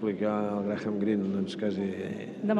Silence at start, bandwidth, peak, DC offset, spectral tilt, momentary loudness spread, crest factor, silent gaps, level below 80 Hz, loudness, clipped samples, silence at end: 0 s; 9 kHz; -14 dBFS; under 0.1%; -8 dB/octave; 5 LU; 16 dB; none; -72 dBFS; -31 LUFS; under 0.1%; 0 s